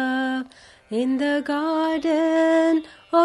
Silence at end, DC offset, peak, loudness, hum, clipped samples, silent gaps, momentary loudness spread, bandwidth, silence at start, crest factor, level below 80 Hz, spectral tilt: 0 s; under 0.1%; -6 dBFS; -22 LUFS; none; under 0.1%; none; 9 LU; 11.5 kHz; 0 s; 14 dB; -64 dBFS; -4.5 dB/octave